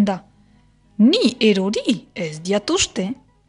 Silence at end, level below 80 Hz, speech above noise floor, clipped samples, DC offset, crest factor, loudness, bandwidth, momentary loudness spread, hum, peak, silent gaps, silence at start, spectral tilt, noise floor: 0.35 s; -52 dBFS; 36 dB; under 0.1%; under 0.1%; 16 dB; -19 LUFS; 11 kHz; 13 LU; 50 Hz at -55 dBFS; -4 dBFS; none; 0 s; -4.5 dB/octave; -54 dBFS